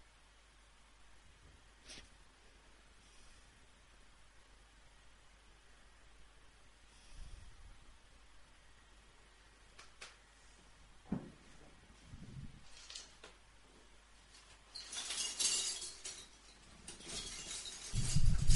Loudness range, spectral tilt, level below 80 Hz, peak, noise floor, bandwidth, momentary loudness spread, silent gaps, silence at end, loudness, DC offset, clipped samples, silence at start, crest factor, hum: 23 LU; -2.5 dB/octave; -46 dBFS; -16 dBFS; -65 dBFS; 11.5 kHz; 25 LU; none; 0 s; -42 LUFS; under 0.1%; under 0.1%; 1.85 s; 26 dB; none